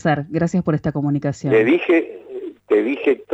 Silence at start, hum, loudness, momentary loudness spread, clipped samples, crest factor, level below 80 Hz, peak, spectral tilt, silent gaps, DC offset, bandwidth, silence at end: 0.05 s; 50 Hz at -45 dBFS; -19 LUFS; 16 LU; under 0.1%; 14 dB; -52 dBFS; -6 dBFS; -7.5 dB/octave; none; under 0.1%; 8 kHz; 0 s